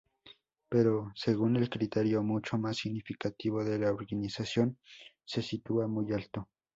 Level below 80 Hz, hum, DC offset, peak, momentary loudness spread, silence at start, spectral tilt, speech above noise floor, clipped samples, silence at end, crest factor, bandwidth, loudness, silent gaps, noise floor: -64 dBFS; none; under 0.1%; -14 dBFS; 9 LU; 0.25 s; -7 dB/octave; 28 dB; under 0.1%; 0.3 s; 18 dB; 7.8 kHz; -33 LUFS; none; -60 dBFS